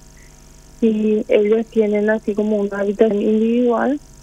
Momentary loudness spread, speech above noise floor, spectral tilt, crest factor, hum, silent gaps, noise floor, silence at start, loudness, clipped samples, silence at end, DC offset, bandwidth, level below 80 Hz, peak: 4 LU; 27 dB; -7.5 dB/octave; 16 dB; none; none; -43 dBFS; 0.8 s; -17 LUFS; under 0.1%; 0.25 s; under 0.1%; 9 kHz; -48 dBFS; 0 dBFS